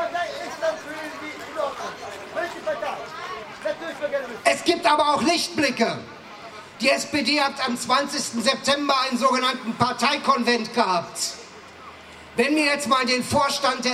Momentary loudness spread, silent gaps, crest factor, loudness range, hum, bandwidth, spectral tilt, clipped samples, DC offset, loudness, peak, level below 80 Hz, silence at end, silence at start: 14 LU; none; 20 dB; 8 LU; none; 16 kHz; -2.5 dB/octave; under 0.1%; under 0.1%; -23 LUFS; -4 dBFS; -64 dBFS; 0 s; 0 s